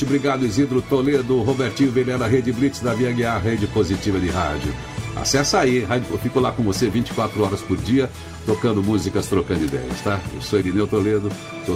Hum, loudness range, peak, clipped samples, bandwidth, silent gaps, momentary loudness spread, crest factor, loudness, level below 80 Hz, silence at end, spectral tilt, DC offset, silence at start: none; 2 LU; -4 dBFS; under 0.1%; 16 kHz; none; 6 LU; 16 dB; -21 LUFS; -40 dBFS; 0 s; -5.5 dB/octave; under 0.1%; 0 s